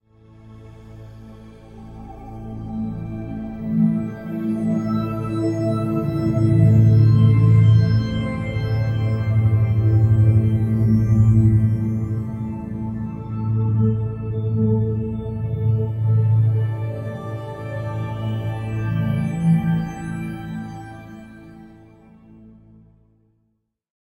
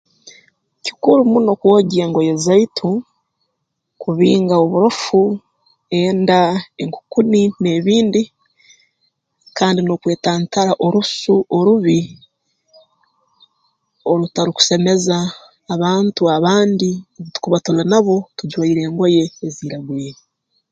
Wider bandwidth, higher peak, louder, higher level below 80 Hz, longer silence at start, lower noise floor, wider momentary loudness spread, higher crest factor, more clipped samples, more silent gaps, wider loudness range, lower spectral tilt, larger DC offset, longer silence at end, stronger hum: second, 5.6 kHz vs 9.2 kHz; second, -4 dBFS vs 0 dBFS; second, -20 LUFS vs -15 LUFS; first, -38 dBFS vs -60 dBFS; first, 0.45 s vs 0.25 s; about the same, -70 dBFS vs -73 dBFS; first, 16 LU vs 13 LU; about the same, 16 dB vs 16 dB; neither; neither; first, 11 LU vs 3 LU; first, -9.5 dB/octave vs -5.5 dB/octave; neither; first, 2.35 s vs 0.6 s; neither